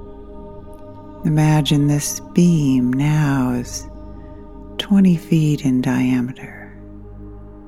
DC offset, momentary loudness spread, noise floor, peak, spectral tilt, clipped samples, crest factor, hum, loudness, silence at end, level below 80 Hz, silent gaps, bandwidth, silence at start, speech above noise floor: 0.5%; 23 LU; -37 dBFS; -2 dBFS; -6 dB/octave; under 0.1%; 16 dB; 50 Hz at -40 dBFS; -17 LUFS; 0 s; -40 dBFS; none; 15 kHz; 0 s; 20 dB